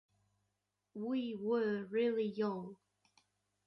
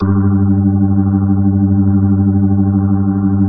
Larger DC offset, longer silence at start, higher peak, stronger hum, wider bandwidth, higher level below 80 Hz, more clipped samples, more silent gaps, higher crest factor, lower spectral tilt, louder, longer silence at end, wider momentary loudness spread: neither; first, 0.95 s vs 0 s; second, -26 dBFS vs -2 dBFS; first, 50 Hz at -65 dBFS vs none; first, 6 kHz vs 1.8 kHz; second, -84 dBFS vs -38 dBFS; neither; neither; about the same, 14 dB vs 10 dB; second, -8 dB/octave vs -16 dB/octave; second, -37 LUFS vs -13 LUFS; first, 0.95 s vs 0 s; first, 11 LU vs 1 LU